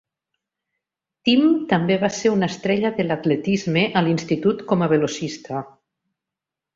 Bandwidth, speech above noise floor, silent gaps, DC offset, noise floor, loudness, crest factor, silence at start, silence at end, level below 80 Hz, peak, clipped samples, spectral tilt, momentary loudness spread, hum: 7.6 kHz; 67 dB; none; under 0.1%; -87 dBFS; -20 LUFS; 18 dB; 1.25 s; 1.1 s; -60 dBFS; -4 dBFS; under 0.1%; -6 dB/octave; 9 LU; none